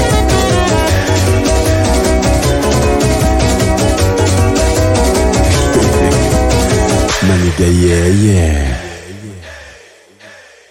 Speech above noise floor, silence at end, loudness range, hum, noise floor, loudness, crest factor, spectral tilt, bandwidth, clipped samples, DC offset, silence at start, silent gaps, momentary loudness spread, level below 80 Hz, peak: 31 dB; 0.45 s; 2 LU; none; -40 dBFS; -11 LUFS; 10 dB; -5 dB/octave; 16.5 kHz; under 0.1%; under 0.1%; 0 s; none; 5 LU; -18 dBFS; 0 dBFS